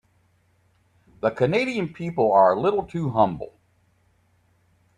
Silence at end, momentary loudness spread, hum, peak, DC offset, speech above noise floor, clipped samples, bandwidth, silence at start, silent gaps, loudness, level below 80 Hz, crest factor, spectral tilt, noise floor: 1.5 s; 11 LU; none; -4 dBFS; under 0.1%; 42 dB; under 0.1%; 11 kHz; 1.25 s; none; -22 LUFS; -58 dBFS; 20 dB; -7.5 dB/octave; -64 dBFS